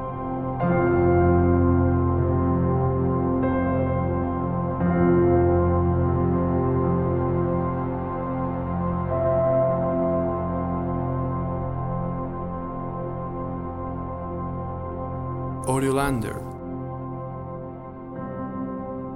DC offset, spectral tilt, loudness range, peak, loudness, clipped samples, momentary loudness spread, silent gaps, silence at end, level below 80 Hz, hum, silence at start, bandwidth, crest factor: under 0.1%; -9 dB/octave; 9 LU; -8 dBFS; -24 LUFS; under 0.1%; 13 LU; none; 0 s; -38 dBFS; none; 0 s; 12.5 kHz; 16 dB